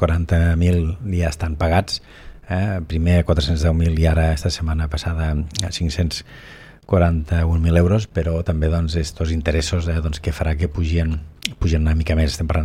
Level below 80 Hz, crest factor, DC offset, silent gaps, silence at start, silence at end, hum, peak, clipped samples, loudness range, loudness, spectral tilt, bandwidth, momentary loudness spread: -28 dBFS; 18 dB; under 0.1%; none; 0 s; 0 s; none; 0 dBFS; under 0.1%; 2 LU; -20 LUFS; -6.5 dB/octave; 11.5 kHz; 7 LU